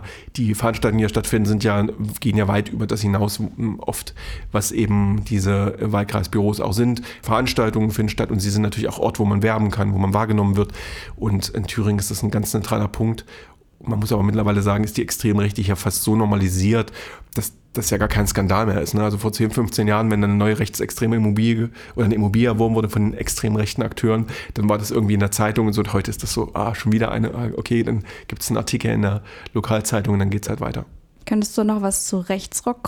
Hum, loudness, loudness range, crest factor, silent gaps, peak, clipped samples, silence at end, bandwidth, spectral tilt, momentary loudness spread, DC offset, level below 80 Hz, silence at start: none; -21 LUFS; 3 LU; 16 dB; none; -4 dBFS; under 0.1%; 0 s; 19.5 kHz; -5.5 dB/octave; 8 LU; under 0.1%; -38 dBFS; 0 s